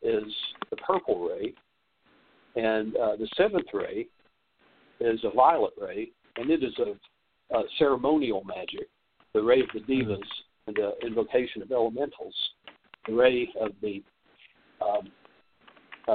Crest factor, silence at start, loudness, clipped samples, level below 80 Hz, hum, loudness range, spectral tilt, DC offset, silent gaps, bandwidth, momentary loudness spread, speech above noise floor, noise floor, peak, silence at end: 22 dB; 0 s; -28 LUFS; under 0.1%; -62 dBFS; none; 3 LU; -3 dB/octave; under 0.1%; none; 4.6 kHz; 14 LU; 41 dB; -68 dBFS; -8 dBFS; 0 s